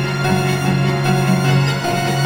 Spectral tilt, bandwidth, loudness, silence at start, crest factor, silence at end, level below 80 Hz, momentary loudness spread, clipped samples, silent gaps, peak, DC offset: -5.5 dB/octave; 17 kHz; -16 LUFS; 0 s; 14 dB; 0 s; -46 dBFS; 3 LU; under 0.1%; none; -2 dBFS; under 0.1%